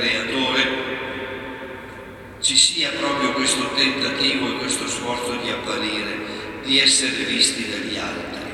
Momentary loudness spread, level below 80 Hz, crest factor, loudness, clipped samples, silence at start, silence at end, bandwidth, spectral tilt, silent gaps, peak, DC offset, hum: 16 LU; -52 dBFS; 22 dB; -20 LUFS; under 0.1%; 0 s; 0 s; 16.5 kHz; -1 dB/octave; none; -2 dBFS; under 0.1%; none